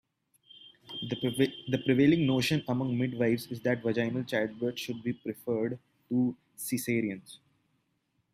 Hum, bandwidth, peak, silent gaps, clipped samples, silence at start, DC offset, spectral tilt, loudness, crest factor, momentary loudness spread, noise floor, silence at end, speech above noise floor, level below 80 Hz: none; 16 kHz; -12 dBFS; none; under 0.1%; 0.55 s; under 0.1%; -6 dB/octave; -30 LUFS; 18 dB; 11 LU; -76 dBFS; 1 s; 47 dB; -66 dBFS